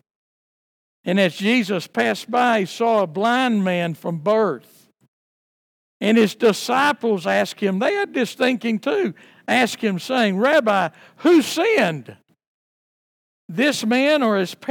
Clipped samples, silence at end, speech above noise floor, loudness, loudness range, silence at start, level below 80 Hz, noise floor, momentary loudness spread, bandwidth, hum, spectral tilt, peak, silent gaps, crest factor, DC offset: under 0.1%; 0 s; over 71 dB; -19 LUFS; 3 LU; 1.05 s; -78 dBFS; under -90 dBFS; 7 LU; 18.5 kHz; none; -5 dB/octave; -4 dBFS; 5.08-6.00 s, 12.47-13.49 s; 18 dB; under 0.1%